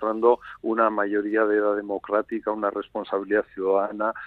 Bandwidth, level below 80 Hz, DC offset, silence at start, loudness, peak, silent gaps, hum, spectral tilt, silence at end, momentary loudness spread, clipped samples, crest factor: 4.4 kHz; -64 dBFS; under 0.1%; 0 s; -24 LUFS; -6 dBFS; none; none; -8.5 dB/octave; 0 s; 7 LU; under 0.1%; 18 dB